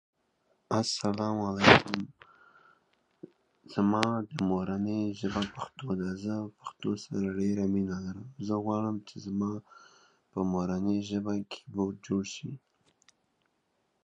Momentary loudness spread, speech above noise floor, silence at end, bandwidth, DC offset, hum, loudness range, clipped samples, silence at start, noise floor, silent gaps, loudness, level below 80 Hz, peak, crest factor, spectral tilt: 12 LU; 46 dB; 1.45 s; 10 kHz; under 0.1%; none; 6 LU; under 0.1%; 0.7 s; -76 dBFS; none; -31 LUFS; -58 dBFS; -2 dBFS; 30 dB; -5.5 dB/octave